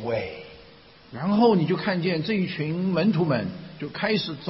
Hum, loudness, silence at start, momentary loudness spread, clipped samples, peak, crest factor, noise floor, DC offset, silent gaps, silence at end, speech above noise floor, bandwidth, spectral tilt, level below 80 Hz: none; -24 LUFS; 0 s; 16 LU; under 0.1%; -8 dBFS; 18 dB; -50 dBFS; under 0.1%; none; 0 s; 26 dB; 5.8 kHz; -11 dB/octave; -58 dBFS